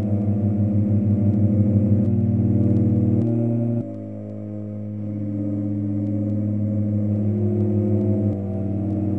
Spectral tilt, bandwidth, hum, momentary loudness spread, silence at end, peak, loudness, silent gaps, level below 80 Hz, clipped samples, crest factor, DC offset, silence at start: -13 dB/octave; 2.6 kHz; none; 11 LU; 0 s; -6 dBFS; -22 LUFS; none; -56 dBFS; under 0.1%; 16 dB; 0.4%; 0 s